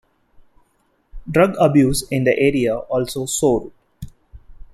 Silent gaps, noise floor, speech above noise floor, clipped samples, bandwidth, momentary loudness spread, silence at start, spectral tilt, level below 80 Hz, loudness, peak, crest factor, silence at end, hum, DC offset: none; -63 dBFS; 46 dB; under 0.1%; 14 kHz; 25 LU; 1.15 s; -5.5 dB/octave; -40 dBFS; -18 LUFS; -2 dBFS; 18 dB; 0.1 s; none; under 0.1%